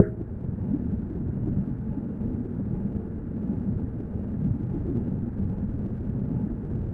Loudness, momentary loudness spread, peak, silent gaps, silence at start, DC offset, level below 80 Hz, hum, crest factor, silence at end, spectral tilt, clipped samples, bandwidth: -30 LUFS; 4 LU; -2 dBFS; none; 0 s; under 0.1%; -38 dBFS; none; 26 dB; 0 s; -13 dB/octave; under 0.1%; 3 kHz